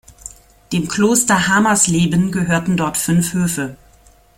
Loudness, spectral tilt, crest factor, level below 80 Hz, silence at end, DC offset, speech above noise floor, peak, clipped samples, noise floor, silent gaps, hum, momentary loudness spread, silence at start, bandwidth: -16 LUFS; -4 dB/octave; 18 dB; -46 dBFS; 0.65 s; under 0.1%; 33 dB; 0 dBFS; under 0.1%; -49 dBFS; none; none; 13 LU; 0.25 s; 16.5 kHz